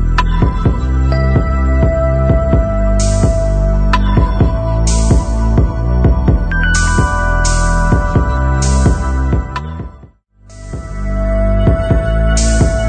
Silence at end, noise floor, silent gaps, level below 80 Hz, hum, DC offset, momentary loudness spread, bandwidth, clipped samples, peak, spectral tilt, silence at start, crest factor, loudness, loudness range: 0 s; -41 dBFS; none; -14 dBFS; none; under 0.1%; 5 LU; 9.4 kHz; under 0.1%; 0 dBFS; -6 dB/octave; 0 s; 10 dB; -14 LUFS; 4 LU